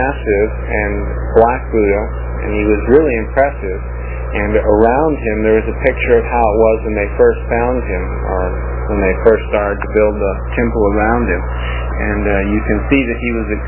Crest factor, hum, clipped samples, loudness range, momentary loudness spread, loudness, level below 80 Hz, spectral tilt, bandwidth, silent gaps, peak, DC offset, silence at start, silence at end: 14 dB; 60 Hz at -20 dBFS; under 0.1%; 2 LU; 8 LU; -15 LUFS; -22 dBFS; -11.5 dB/octave; 3.7 kHz; none; 0 dBFS; under 0.1%; 0 s; 0 s